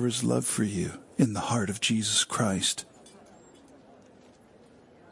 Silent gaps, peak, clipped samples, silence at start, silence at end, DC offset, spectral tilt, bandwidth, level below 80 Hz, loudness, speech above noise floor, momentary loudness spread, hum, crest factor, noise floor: none; -10 dBFS; under 0.1%; 0 s; 2.05 s; under 0.1%; -3.5 dB/octave; 11.5 kHz; -66 dBFS; -27 LUFS; 28 dB; 9 LU; none; 20 dB; -56 dBFS